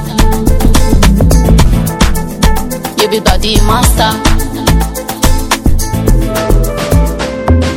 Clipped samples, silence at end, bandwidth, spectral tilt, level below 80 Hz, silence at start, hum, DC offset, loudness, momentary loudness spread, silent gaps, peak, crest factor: 2%; 0 s; 17.5 kHz; -5 dB/octave; -12 dBFS; 0 s; none; under 0.1%; -11 LUFS; 5 LU; none; 0 dBFS; 8 dB